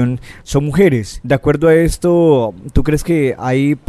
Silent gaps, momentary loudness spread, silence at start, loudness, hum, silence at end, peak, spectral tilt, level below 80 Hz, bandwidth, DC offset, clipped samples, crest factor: none; 8 LU; 0 s; -14 LUFS; none; 0.1 s; 0 dBFS; -7 dB/octave; -28 dBFS; 14 kHz; under 0.1%; under 0.1%; 12 dB